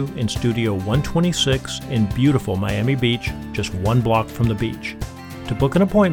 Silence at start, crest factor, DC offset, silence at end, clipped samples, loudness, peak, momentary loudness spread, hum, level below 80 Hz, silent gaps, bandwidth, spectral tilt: 0 s; 16 dB; under 0.1%; 0 s; under 0.1%; -20 LUFS; -4 dBFS; 9 LU; none; -36 dBFS; none; 18 kHz; -6 dB/octave